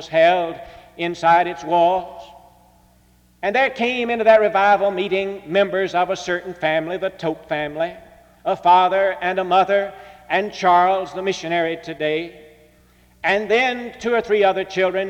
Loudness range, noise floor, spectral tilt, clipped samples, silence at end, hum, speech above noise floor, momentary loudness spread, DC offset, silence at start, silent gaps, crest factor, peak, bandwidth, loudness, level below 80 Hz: 4 LU; -55 dBFS; -5 dB/octave; under 0.1%; 0 s; none; 36 dB; 11 LU; under 0.1%; 0 s; none; 16 dB; -4 dBFS; 9.6 kHz; -19 LUFS; -56 dBFS